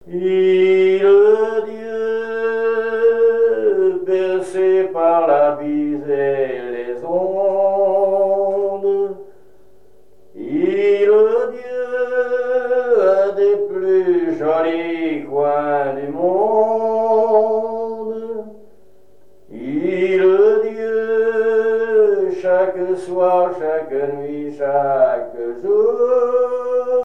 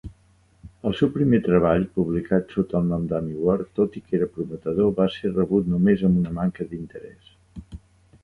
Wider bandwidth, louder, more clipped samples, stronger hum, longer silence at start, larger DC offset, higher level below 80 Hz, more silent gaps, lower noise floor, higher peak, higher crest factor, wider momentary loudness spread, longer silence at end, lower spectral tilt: first, 9.6 kHz vs 4.4 kHz; first, -17 LUFS vs -23 LUFS; neither; neither; about the same, 0.05 s vs 0.05 s; first, 0.9% vs under 0.1%; second, -66 dBFS vs -46 dBFS; neither; second, -52 dBFS vs -58 dBFS; about the same, -4 dBFS vs -6 dBFS; about the same, 14 dB vs 18 dB; about the same, 10 LU vs 12 LU; second, 0 s vs 0.45 s; second, -7 dB/octave vs -9.5 dB/octave